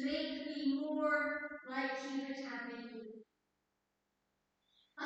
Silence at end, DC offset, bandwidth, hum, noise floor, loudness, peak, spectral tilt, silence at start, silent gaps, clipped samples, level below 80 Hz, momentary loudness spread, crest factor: 0 s; under 0.1%; 8.2 kHz; none; -85 dBFS; -39 LUFS; -22 dBFS; -3.5 dB/octave; 0 s; none; under 0.1%; -78 dBFS; 16 LU; 18 dB